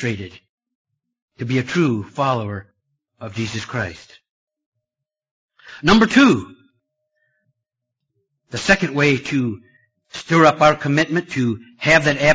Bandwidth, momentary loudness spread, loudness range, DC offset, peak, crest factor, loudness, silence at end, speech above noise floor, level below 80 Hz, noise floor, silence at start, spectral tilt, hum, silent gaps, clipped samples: 8 kHz; 18 LU; 9 LU; under 0.1%; 0 dBFS; 20 dB; -17 LUFS; 0 s; 67 dB; -48 dBFS; -85 dBFS; 0 s; -5.5 dB/octave; none; 0.49-0.58 s, 0.75-0.85 s, 1.22-1.28 s, 4.29-4.47 s, 4.66-4.72 s, 5.31-5.48 s; under 0.1%